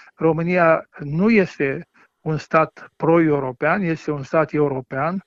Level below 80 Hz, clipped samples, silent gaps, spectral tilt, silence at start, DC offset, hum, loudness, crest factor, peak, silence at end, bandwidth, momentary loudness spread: -54 dBFS; under 0.1%; none; -8.5 dB/octave; 0.2 s; under 0.1%; none; -20 LUFS; 18 dB; -2 dBFS; 0.05 s; 7.6 kHz; 9 LU